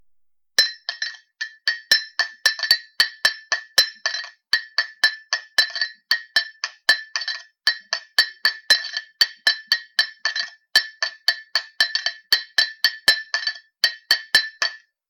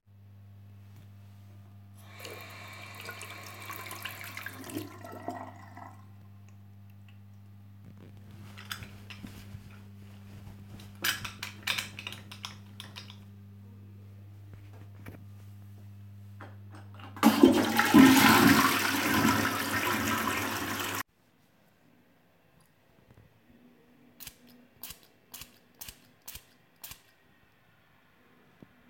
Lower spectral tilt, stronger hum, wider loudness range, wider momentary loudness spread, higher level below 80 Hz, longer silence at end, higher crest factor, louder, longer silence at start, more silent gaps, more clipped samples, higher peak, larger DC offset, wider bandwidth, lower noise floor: second, 3 dB/octave vs -4 dB/octave; neither; second, 2 LU vs 26 LU; second, 9 LU vs 28 LU; second, -70 dBFS vs -62 dBFS; second, 0.3 s vs 1.95 s; second, 22 dB vs 28 dB; first, -20 LUFS vs -26 LUFS; second, 0.6 s vs 1.6 s; neither; neither; about the same, -2 dBFS vs -4 dBFS; neither; first, 19 kHz vs 17 kHz; about the same, -64 dBFS vs -67 dBFS